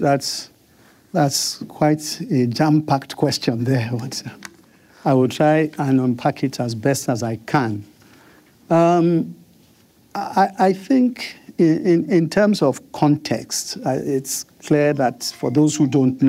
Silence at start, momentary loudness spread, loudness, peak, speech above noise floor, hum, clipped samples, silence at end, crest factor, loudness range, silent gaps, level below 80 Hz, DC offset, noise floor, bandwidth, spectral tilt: 0 s; 10 LU; -19 LUFS; -4 dBFS; 35 dB; none; under 0.1%; 0 s; 14 dB; 3 LU; none; -60 dBFS; under 0.1%; -54 dBFS; 16 kHz; -5.5 dB/octave